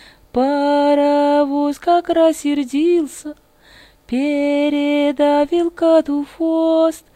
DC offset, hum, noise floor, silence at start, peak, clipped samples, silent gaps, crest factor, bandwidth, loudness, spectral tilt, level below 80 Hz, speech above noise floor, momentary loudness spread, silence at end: under 0.1%; none; -47 dBFS; 0.35 s; -2 dBFS; under 0.1%; none; 14 dB; 13.5 kHz; -16 LUFS; -4 dB/octave; -52 dBFS; 31 dB; 7 LU; 0.15 s